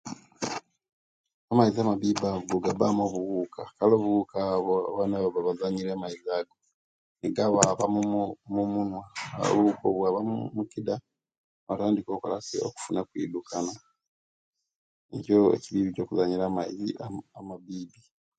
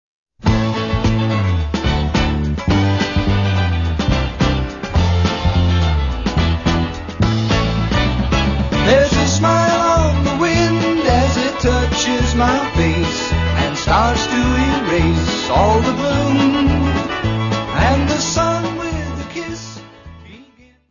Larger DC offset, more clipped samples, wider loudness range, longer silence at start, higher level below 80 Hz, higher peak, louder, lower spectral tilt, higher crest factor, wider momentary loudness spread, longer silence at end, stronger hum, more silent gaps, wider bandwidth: neither; neither; first, 6 LU vs 3 LU; second, 0.05 s vs 0.45 s; second, -64 dBFS vs -24 dBFS; about the same, 0 dBFS vs -2 dBFS; second, -28 LUFS vs -16 LUFS; about the same, -5.5 dB/octave vs -5.5 dB/octave; first, 28 dB vs 14 dB; first, 14 LU vs 6 LU; about the same, 0.5 s vs 0.5 s; neither; first, 0.92-1.24 s, 1.34-1.48 s, 6.74-7.15 s, 11.38-11.67 s, 14.08-14.53 s, 14.76-15.09 s vs none; first, 9.4 kHz vs 7.4 kHz